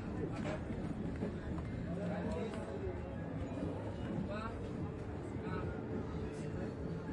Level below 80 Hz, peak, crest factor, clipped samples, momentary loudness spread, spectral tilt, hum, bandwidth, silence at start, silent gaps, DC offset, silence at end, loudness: -52 dBFS; -26 dBFS; 14 dB; under 0.1%; 3 LU; -8 dB/octave; none; 11 kHz; 0 s; none; under 0.1%; 0 s; -42 LUFS